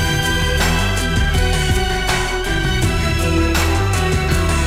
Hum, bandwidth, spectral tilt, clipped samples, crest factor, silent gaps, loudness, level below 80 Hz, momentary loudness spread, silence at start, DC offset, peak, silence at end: none; 16.5 kHz; -4.5 dB/octave; under 0.1%; 12 dB; none; -17 LUFS; -20 dBFS; 2 LU; 0 s; under 0.1%; -4 dBFS; 0 s